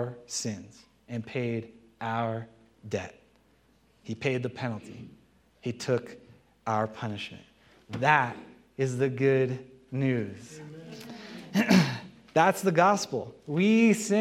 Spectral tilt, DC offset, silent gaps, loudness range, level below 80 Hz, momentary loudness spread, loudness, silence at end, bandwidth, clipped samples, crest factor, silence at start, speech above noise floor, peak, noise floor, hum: -5.5 dB/octave; under 0.1%; none; 9 LU; -70 dBFS; 21 LU; -28 LUFS; 0 s; 15.5 kHz; under 0.1%; 24 dB; 0 s; 37 dB; -6 dBFS; -64 dBFS; none